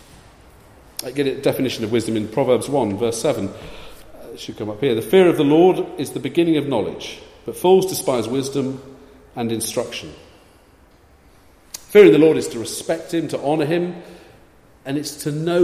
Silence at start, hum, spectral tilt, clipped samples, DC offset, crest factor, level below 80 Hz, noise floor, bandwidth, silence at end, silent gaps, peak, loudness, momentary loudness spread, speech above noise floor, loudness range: 1 s; none; -5.5 dB/octave; under 0.1%; under 0.1%; 20 dB; -54 dBFS; -51 dBFS; 15.5 kHz; 0 s; none; 0 dBFS; -19 LUFS; 20 LU; 33 dB; 7 LU